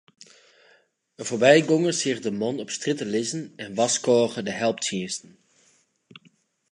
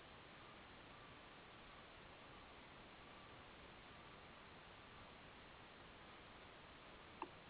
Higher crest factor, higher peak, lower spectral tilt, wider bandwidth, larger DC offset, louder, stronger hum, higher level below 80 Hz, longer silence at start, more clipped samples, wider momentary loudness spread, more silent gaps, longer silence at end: about the same, 22 dB vs 26 dB; first, -2 dBFS vs -34 dBFS; about the same, -3.5 dB/octave vs -2.5 dB/octave; first, 11 kHz vs 4 kHz; neither; first, -23 LUFS vs -60 LUFS; neither; about the same, -72 dBFS vs -74 dBFS; first, 1.2 s vs 0 s; neither; first, 15 LU vs 1 LU; neither; first, 1.55 s vs 0 s